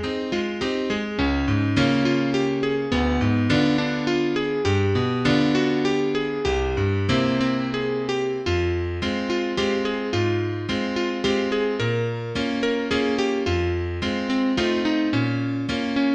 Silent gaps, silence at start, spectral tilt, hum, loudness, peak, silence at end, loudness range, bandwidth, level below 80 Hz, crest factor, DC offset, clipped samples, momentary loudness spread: none; 0 s; -6 dB/octave; none; -23 LUFS; -8 dBFS; 0 s; 3 LU; 9.2 kHz; -40 dBFS; 16 dB; under 0.1%; under 0.1%; 5 LU